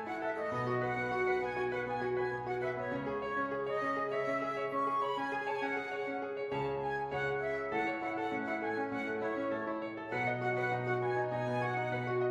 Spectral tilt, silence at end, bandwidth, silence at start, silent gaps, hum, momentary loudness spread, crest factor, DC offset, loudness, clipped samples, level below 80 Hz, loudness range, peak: -7 dB/octave; 0 s; 11.5 kHz; 0 s; none; none; 4 LU; 14 dB; under 0.1%; -35 LUFS; under 0.1%; -66 dBFS; 1 LU; -22 dBFS